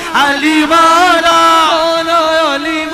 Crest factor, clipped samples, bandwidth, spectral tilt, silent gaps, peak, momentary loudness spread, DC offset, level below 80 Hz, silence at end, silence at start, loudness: 10 dB; under 0.1%; 15.5 kHz; -2 dB/octave; none; 0 dBFS; 5 LU; under 0.1%; -44 dBFS; 0 s; 0 s; -9 LUFS